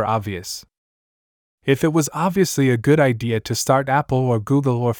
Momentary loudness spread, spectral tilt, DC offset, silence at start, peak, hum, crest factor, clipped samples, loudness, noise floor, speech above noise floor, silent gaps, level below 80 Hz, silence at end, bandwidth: 12 LU; -5.5 dB/octave; under 0.1%; 0 s; -2 dBFS; none; 16 dB; under 0.1%; -19 LUFS; under -90 dBFS; over 71 dB; 0.78-1.58 s; -52 dBFS; 0 s; 20 kHz